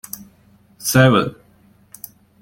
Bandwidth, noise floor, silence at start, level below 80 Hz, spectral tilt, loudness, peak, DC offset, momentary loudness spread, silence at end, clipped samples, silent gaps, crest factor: 17 kHz; -53 dBFS; 0.8 s; -52 dBFS; -5 dB/octave; -16 LUFS; -2 dBFS; under 0.1%; 24 LU; 1.1 s; under 0.1%; none; 18 dB